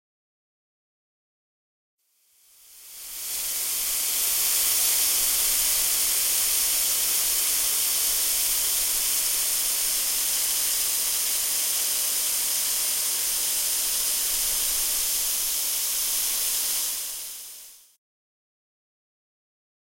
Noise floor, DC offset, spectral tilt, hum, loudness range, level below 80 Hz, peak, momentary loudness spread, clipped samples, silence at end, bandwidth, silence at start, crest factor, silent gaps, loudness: -63 dBFS; under 0.1%; 3 dB/octave; none; 8 LU; -54 dBFS; -8 dBFS; 6 LU; under 0.1%; 2.25 s; 16.5 kHz; 2.7 s; 18 dB; none; -21 LUFS